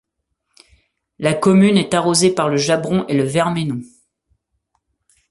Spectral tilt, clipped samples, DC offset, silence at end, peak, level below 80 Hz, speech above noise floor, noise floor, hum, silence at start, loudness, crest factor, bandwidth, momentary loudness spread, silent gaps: -5 dB/octave; under 0.1%; under 0.1%; 1.45 s; -2 dBFS; -56 dBFS; 58 dB; -74 dBFS; none; 1.2 s; -16 LUFS; 16 dB; 11.5 kHz; 10 LU; none